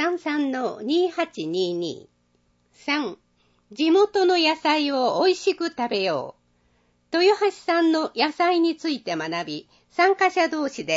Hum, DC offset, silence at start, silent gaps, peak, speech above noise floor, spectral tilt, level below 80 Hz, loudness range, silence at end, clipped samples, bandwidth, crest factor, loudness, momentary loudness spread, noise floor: none; under 0.1%; 0 s; none; -6 dBFS; 44 dB; -4 dB/octave; -72 dBFS; 5 LU; 0 s; under 0.1%; 8 kHz; 18 dB; -22 LUFS; 11 LU; -66 dBFS